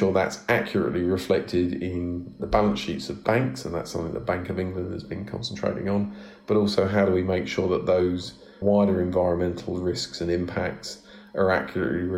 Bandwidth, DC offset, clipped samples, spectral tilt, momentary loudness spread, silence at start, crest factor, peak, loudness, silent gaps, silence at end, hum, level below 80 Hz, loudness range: 15.5 kHz; under 0.1%; under 0.1%; -6 dB/octave; 10 LU; 0 s; 20 dB; -6 dBFS; -26 LUFS; none; 0 s; none; -48 dBFS; 4 LU